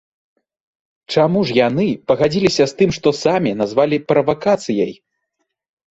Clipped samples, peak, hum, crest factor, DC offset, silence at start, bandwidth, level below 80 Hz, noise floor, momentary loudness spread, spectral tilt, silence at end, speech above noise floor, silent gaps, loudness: under 0.1%; -2 dBFS; none; 16 dB; under 0.1%; 1.1 s; 8 kHz; -52 dBFS; -74 dBFS; 4 LU; -6 dB/octave; 1 s; 58 dB; none; -17 LUFS